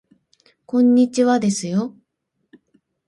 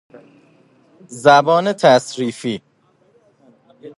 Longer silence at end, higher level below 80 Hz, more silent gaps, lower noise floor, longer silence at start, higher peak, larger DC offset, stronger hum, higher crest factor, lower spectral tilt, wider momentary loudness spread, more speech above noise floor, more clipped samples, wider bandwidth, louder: first, 1.15 s vs 0.1 s; about the same, -66 dBFS vs -66 dBFS; neither; first, -74 dBFS vs -57 dBFS; second, 0.75 s vs 1.1 s; second, -6 dBFS vs 0 dBFS; neither; neither; about the same, 14 dB vs 18 dB; about the same, -5.5 dB/octave vs -4.5 dB/octave; second, 9 LU vs 15 LU; first, 57 dB vs 43 dB; neither; about the same, 11.5 kHz vs 11.5 kHz; second, -18 LUFS vs -15 LUFS